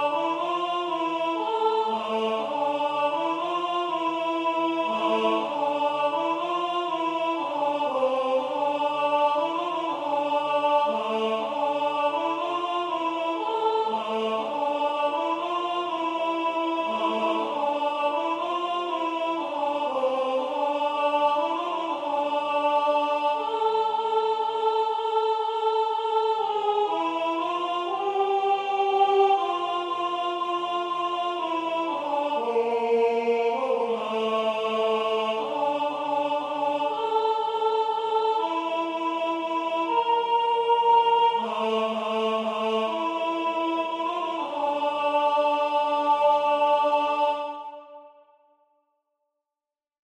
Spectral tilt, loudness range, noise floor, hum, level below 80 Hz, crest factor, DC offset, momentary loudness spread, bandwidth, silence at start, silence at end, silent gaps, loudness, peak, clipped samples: -4 dB/octave; 3 LU; under -90 dBFS; none; -82 dBFS; 16 dB; under 0.1%; 5 LU; 10 kHz; 0 s; 1.95 s; none; -25 LUFS; -10 dBFS; under 0.1%